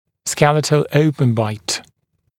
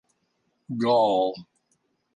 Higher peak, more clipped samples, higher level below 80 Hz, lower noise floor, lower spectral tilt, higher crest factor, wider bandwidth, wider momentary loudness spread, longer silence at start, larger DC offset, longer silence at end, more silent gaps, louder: first, 0 dBFS vs -10 dBFS; neither; first, -54 dBFS vs -72 dBFS; second, -61 dBFS vs -73 dBFS; second, -5 dB/octave vs -7 dB/octave; about the same, 18 dB vs 16 dB; first, 16.5 kHz vs 9.8 kHz; second, 9 LU vs 16 LU; second, 0.25 s vs 0.7 s; neither; second, 0.6 s vs 0.75 s; neither; first, -17 LUFS vs -23 LUFS